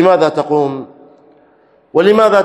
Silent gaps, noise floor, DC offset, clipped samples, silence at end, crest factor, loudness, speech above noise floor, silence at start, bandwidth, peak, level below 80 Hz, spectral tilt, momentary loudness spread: none; -50 dBFS; under 0.1%; 0.4%; 0 s; 14 dB; -13 LUFS; 39 dB; 0 s; 12 kHz; 0 dBFS; -58 dBFS; -6.5 dB/octave; 10 LU